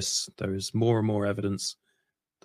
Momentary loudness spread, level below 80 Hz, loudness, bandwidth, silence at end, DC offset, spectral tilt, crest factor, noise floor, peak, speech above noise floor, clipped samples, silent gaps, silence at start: 8 LU; -66 dBFS; -28 LUFS; 16 kHz; 0.7 s; under 0.1%; -4.5 dB/octave; 16 dB; -79 dBFS; -14 dBFS; 51 dB; under 0.1%; none; 0 s